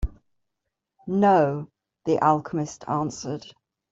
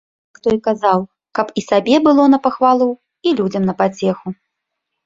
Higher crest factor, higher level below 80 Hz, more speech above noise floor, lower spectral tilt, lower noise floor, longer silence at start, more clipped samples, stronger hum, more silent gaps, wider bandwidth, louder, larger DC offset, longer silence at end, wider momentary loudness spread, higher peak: about the same, 18 dB vs 16 dB; first, -40 dBFS vs -56 dBFS; about the same, 59 dB vs 62 dB; about the same, -6.5 dB/octave vs -6.5 dB/octave; first, -82 dBFS vs -77 dBFS; second, 0 s vs 0.45 s; neither; neither; neither; about the same, 7.8 kHz vs 7.6 kHz; second, -24 LUFS vs -16 LUFS; neither; second, 0.4 s vs 0.75 s; first, 17 LU vs 11 LU; second, -6 dBFS vs 0 dBFS